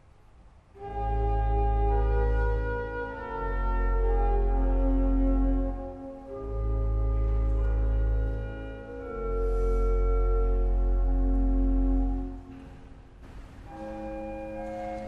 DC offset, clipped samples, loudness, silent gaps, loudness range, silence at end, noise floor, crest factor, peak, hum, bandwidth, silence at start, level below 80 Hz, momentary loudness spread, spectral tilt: under 0.1%; under 0.1%; -30 LUFS; none; 3 LU; 0 s; -54 dBFS; 12 dB; -16 dBFS; none; 3 kHz; 0.75 s; -28 dBFS; 13 LU; -10 dB/octave